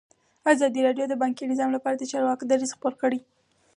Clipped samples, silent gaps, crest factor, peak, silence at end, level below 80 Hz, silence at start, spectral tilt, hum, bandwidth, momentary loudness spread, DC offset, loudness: under 0.1%; none; 20 dB; -6 dBFS; 0.55 s; -78 dBFS; 0.45 s; -3.5 dB/octave; none; 11 kHz; 6 LU; under 0.1%; -25 LUFS